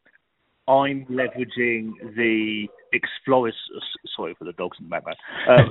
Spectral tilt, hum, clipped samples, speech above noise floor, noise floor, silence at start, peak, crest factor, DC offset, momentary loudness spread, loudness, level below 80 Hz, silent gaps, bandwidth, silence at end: -4.5 dB/octave; none; under 0.1%; 48 dB; -70 dBFS; 0.65 s; 0 dBFS; 22 dB; under 0.1%; 13 LU; -24 LUFS; -54 dBFS; none; 4.1 kHz; 0 s